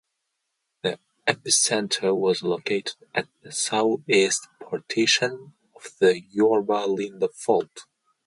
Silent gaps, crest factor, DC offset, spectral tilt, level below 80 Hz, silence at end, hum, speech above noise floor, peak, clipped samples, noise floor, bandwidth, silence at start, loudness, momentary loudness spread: none; 22 dB; under 0.1%; -2.5 dB/octave; -72 dBFS; 0.45 s; none; 55 dB; -4 dBFS; under 0.1%; -79 dBFS; 11.5 kHz; 0.85 s; -23 LUFS; 10 LU